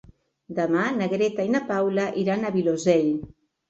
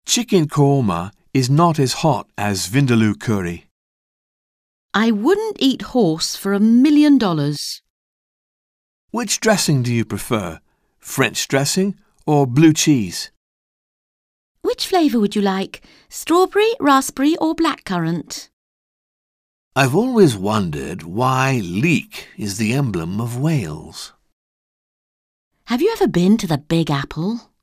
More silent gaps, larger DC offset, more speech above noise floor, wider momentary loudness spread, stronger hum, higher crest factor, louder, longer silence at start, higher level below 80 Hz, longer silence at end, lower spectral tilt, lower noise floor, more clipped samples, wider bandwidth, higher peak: second, none vs 3.71-4.89 s, 7.90-9.08 s, 13.37-14.55 s, 18.53-19.71 s, 24.33-25.51 s; neither; second, 20 dB vs over 73 dB; second, 6 LU vs 13 LU; neither; about the same, 18 dB vs 18 dB; second, -24 LUFS vs -18 LUFS; first, 0.5 s vs 0.05 s; second, -60 dBFS vs -50 dBFS; first, 0.4 s vs 0.2 s; about the same, -6 dB/octave vs -5 dB/octave; second, -43 dBFS vs under -90 dBFS; neither; second, 8.2 kHz vs 16 kHz; second, -6 dBFS vs -2 dBFS